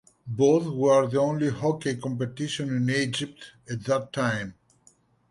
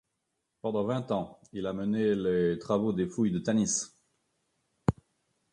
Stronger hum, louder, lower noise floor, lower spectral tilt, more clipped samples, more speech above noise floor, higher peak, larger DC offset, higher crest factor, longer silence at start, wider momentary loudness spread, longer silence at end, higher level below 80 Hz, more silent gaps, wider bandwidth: neither; first, -26 LUFS vs -30 LUFS; second, -62 dBFS vs -82 dBFS; about the same, -5.5 dB/octave vs -5.5 dB/octave; neither; second, 36 dB vs 52 dB; about the same, -10 dBFS vs -10 dBFS; neither; second, 16 dB vs 22 dB; second, 0.25 s vs 0.65 s; first, 14 LU vs 10 LU; first, 0.8 s vs 0.6 s; second, -62 dBFS vs -56 dBFS; neither; about the same, 11.5 kHz vs 11 kHz